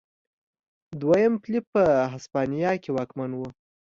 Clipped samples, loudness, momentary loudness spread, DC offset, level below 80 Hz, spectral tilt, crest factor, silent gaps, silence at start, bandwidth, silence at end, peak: under 0.1%; -25 LUFS; 12 LU; under 0.1%; -60 dBFS; -7.5 dB/octave; 18 dB; 1.67-1.73 s; 0.9 s; 7.6 kHz; 0.35 s; -8 dBFS